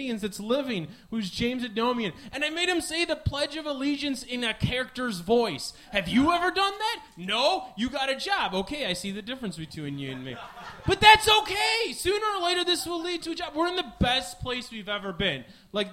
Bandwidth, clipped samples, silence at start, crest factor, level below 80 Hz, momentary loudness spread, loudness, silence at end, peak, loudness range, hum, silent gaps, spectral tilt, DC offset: 16 kHz; under 0.1%; 0 s; 24 dB; -48 dBFS; 12 LU; -26 LUFS; 0 s; -2 dBFS; 6 LU; none; none; -3.5 dB/octave; under 0.1%